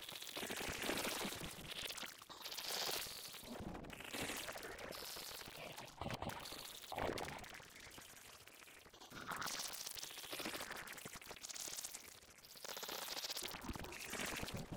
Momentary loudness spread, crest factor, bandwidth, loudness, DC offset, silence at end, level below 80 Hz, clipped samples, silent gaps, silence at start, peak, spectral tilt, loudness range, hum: 13 LU; 22 dB; 18 kHz; -46 LUFS; under 0.1%; 0 s; -66 dBFS; under 0.1%; none; 0 s; -26 dBFS; -2 dB/octave; 5 LU; none